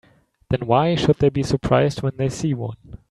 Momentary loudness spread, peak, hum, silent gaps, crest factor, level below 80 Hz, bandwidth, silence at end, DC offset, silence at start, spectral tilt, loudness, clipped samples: 9 LU; -2 dBFS; none; none; 18 dB; -42 dBFS; 11.5 kHz; 0.15 s; under 0.1%; 0.5 s; -6.5 dB/octave; -20 LUFS; under 0.1%